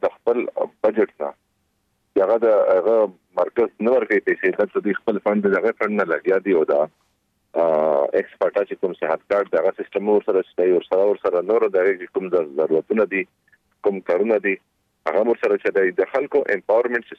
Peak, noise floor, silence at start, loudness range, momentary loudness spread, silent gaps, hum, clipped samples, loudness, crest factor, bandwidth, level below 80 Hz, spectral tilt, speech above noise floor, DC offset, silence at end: -6 dBFS; -69 dBFS; 0.05 s; 2 LU; 7 LU; none; none; under 0.1%; -20 LUFS; 14 dB; 5.8 kHz; -68 dBFS; -8 dB/octave; 50 dB; under 0.1%; 0.05 s